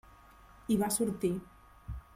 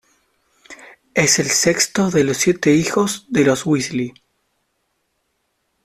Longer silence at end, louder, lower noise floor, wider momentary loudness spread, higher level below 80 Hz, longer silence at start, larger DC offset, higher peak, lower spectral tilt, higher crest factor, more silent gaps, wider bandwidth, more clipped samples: second, 0.15 s vs 1.75 s; second, -32 LUFS vs -17 LUFS; second, -57 dBFS vs -70 dBFS; first, 18 LU vs 8 LU; about the same, -52 dBFS vs -54 dBFS; second, 0.5 s vs 0.7 s; neither; second, -18 dBFS vs -2 dBFS; first, -5 dB/octave vs -3.5 dB/octave; about the same, 18 dB vs 18 dB; neither; about the same, 16.5 kHz vs 15 kHz; neither